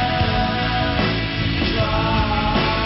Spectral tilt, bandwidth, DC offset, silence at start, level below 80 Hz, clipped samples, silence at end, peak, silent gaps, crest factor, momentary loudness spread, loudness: -9.5 dB/octave; 5.8 kHz; under 0.1%; 0 s; -28 dBFS; under 0.1%; 0 s; -6 dBFS; none; 12 dB; 2 LU; -19 LUFS